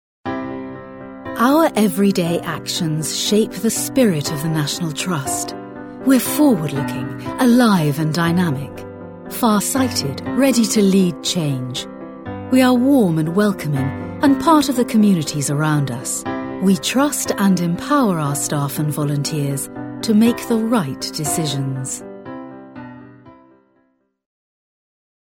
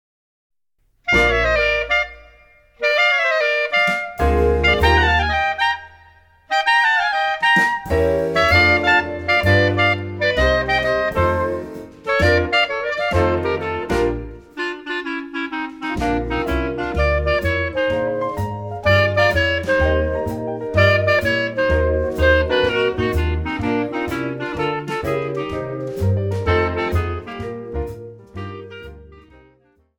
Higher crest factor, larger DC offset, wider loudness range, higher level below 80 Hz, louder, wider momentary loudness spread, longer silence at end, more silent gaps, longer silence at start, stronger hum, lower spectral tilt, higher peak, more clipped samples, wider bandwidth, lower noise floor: about the same, 16 dB vs 16 dB; neither; second, 4 LU vs 7 LU; second, -52 dBFS vs -30 dBFS; about the same, -18 LUFS vs -18 LUFS; first, 16 LU vs 12 LU; first, 2 s vs 0.8 s; neither; second, 0.25 s vs 1.05 s; neither; about the same, -5 dB/octave vs -6 dB/octave; about the same, -2 dBFS vs -2 dBFS; neither; about the same, 17.5 kHz vs 18 kHz; about the same, -63 dBFS vs -63 dBFS